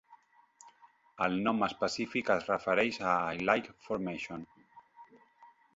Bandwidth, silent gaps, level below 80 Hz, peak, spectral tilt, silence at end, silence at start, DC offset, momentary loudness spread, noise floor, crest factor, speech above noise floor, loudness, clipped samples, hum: 7.6 kHz; none; -68 dBFS; -12 dBFS; -3.5 dB/octave; 0.3 s; 0.1 s; under 0.1%; 10 LU; -62 dBFS; 24 dB; 30 dB; -32 LUFS; under 0.1%; none